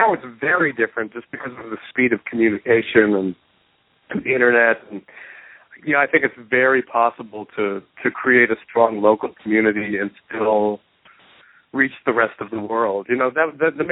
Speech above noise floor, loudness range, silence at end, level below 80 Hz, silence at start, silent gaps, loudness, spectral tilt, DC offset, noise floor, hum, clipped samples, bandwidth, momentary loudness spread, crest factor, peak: 42 dB; 3 LU; 0 s; -64 dBFS; 0 s; none; -19 LUFS; -10.5 dB/octave; under 0.1%; -61 dBFS; none; under 0.1%; 4.1 kHz; 16 LU; 20 dB; 0 dBFS